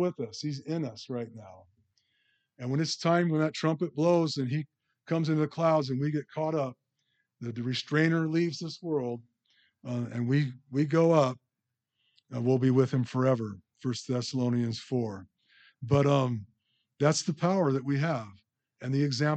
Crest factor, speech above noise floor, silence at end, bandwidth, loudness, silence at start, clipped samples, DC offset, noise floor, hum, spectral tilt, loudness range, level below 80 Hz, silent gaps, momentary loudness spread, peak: 20 dB; 58 dB; 0 s; 8.8 kHz; -29 LUFS; 0 s; under 0.1%; under 0.1%; -86 dBFS; none; -6.5 dB/octave; 3 LU; -72 dBFS; none; 13 LU; -10 dBFS